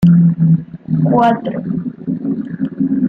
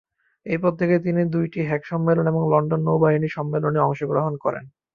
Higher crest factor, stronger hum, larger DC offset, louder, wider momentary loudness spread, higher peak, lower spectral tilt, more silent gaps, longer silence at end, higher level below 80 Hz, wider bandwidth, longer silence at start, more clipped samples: about the same, 14 dB vs 16 dB; neither; neither; first, -16 LUFS vs -22 LUFS; first, 11 LU vs 7 LU; first, 0 dBFS vs -4 dBFS; about the same, -10.5 dB/octave vs -10.5 dB/octave; neither; second, 0 s vs 0.25 s; first, -48 dBFS vs -60 dBFS; second, 3.7 kHz vs 5.2 kHz; second, 0 s vs 0.45 s; neither